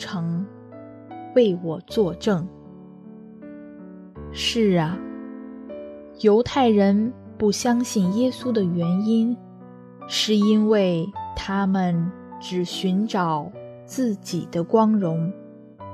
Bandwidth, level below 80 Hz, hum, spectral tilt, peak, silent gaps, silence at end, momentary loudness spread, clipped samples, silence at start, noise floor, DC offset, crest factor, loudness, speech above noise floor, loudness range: 13.5 kHz; -54 dBFS; none; -6 dB/octave; -6 dBFS; none; 0 s; 22 LU; under 0.1%; 0 s; -43 dBFS; under 0.1%; 18 dB; -22 LUFS; 22 dB; 5 LU